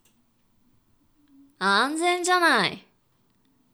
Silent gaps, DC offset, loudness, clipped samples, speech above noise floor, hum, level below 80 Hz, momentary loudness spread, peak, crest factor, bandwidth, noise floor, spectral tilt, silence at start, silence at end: none; under 0.1%; -22 LUFS; under 0.1%; 45 dB; none; -74 dBFS; 8 LU; -8 dBFS; 18 dB; over 20 kHz; -67 dBFS; -2.5 dB/octave; 1.6 s; 0.95 s